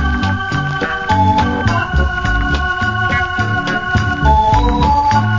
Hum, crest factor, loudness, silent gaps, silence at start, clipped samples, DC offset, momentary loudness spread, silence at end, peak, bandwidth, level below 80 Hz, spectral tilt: none; 14 dB; -15 LUFS; none; 0 s; under 0.1%; under 0.1%; 5 LU; 0 s; 0 dBFS; 7.6 kHz; -22 dBFS; -6 dB/octave